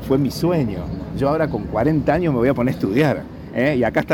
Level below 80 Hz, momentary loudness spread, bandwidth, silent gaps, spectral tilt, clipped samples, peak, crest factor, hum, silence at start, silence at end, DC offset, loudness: -38 dBFS; 7 LU; 18 kHz; none; -7.5 dB/octave; under 0.1%; -6 dBFS; 12 dB; none; 0 s; 0 s; under 0.1%; -20 LUFS